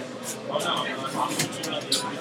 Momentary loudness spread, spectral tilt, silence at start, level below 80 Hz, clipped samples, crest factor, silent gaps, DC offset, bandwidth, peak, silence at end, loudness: 5 LU; -2.5 dB/octave; 0 s; -70 dBFS; under 0.1%; 20 dB; none; under 0.1%; 18 kHz; -8 dBFS; 0 s; -27 LUFS